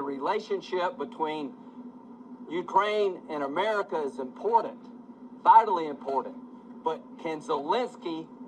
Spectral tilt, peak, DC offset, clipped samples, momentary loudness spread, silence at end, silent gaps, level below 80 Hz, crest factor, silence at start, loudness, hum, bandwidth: -5 dB/octave; -6 dBFS; under 0.1%; under 0.1%; 21 LU; 0 s; none; -78 dBFS; 22 dB; 0 s; -28 LUFS; none; 9.2 kHz